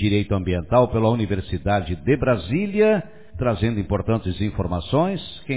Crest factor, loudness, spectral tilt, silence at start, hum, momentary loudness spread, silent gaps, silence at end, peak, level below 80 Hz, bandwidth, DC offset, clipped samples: 16 dB; -22 LUFS; -11.5 dB/octave; 0 s; none; 7 LU; none; 0 s; -6 dBFS; -36 dBFS; 4 kHz; 0.7%; under 0.1%